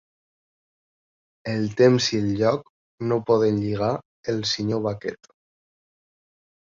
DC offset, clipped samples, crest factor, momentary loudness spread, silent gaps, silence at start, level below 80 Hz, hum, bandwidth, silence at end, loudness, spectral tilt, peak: under 0.1%; under 0.1%; 20 dB; 12 LU; 2.70-2.98 s, 4.05-4.23 s; 1.45 s; -56 dBFS; none; 7.6 kHz; 1.5 s; -23 LUFS; -5.5 dB/octave; -4 dBFS